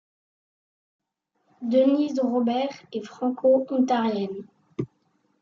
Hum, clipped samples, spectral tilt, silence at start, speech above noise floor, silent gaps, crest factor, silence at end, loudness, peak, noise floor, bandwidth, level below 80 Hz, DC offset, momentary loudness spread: none; under 0.1%; -7 dB/octave; 1.6 s; 50 dB; none; 16 dB; 0.55 s; -24 LUFS; -10 dBFS; -73 dBFS; 7.2 kHz; -74 dBFS; under 0.1%; 15 LU